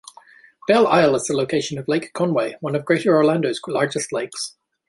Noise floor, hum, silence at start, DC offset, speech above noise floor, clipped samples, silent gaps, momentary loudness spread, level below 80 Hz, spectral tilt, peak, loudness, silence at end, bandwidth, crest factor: -49 dBFS; none; 0.7 s; under 0.1%; 30 dB; under 0.1%; none; 10 LU; -62 dBFS; -5 dB/octave; -2 dBFS; -20 LUFS; 0.4 s; 11.5 kHz; 18 dB